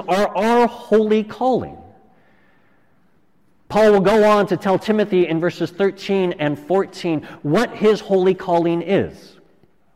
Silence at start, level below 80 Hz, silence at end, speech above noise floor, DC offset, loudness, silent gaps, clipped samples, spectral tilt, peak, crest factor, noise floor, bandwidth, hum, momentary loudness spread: 0 s; -52 dBFS; 0.85 s; 44 dB; under 0.1%; -18 LUFS; none; under 0.1%; -6.5 dB/octave; -6 dBFS; 14 dB; -61 dBFS; 15 kHz; none; 9 LU